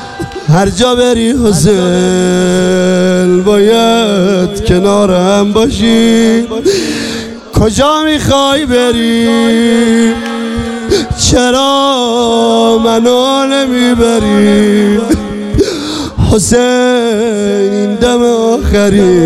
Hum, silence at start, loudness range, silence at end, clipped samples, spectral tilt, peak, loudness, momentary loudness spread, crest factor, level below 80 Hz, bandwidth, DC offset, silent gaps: none; 0 s; 2 LU; 0 s; under 0.1%; -5 dB/octave; 0 dBFS; -9 LUFS; 5 LU; 8 dB; -28 dBFS; 14 kHz; under 0.1%; none